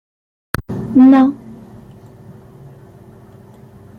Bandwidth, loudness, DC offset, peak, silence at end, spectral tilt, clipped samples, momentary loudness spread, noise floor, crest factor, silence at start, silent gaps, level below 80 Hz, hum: 15 kHz; -13 LUFS; under 0.1%; -2 dBFS; 2.45 s; -7.5 dB/octave; under 0.1%; 23 LU; -41 dBFS; 16 dB; 0.6 s; none; -44 dBFS; none